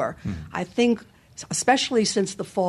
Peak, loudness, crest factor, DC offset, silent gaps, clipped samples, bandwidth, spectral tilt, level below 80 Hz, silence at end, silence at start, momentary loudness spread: -6 dBFS; -24 LUFS; 18 dB; under 0.1%; none; under 0.1%; 13 kHz; -3.5 dB/octave; -52 dBFS; 0 s; 0 s; 13 LU